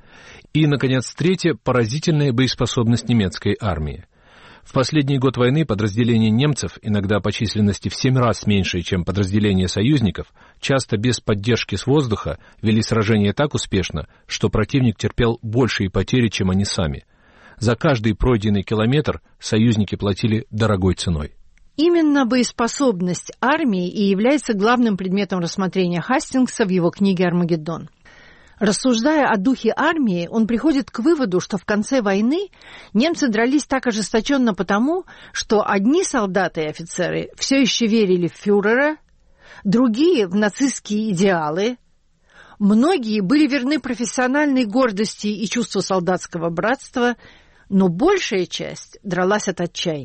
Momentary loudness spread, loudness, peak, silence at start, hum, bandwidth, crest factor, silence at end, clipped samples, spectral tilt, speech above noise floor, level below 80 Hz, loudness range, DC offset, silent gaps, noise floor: 7 LU; -19 LUFS; -6 dBFS; 0.25 s; none; 8.8 kHz; 14 dB; 0 s; under 0.1%; -5.5 dB/octave; 38 dB; -40 dBFS; 2 LU; under 0.1%; none; -57 dBFS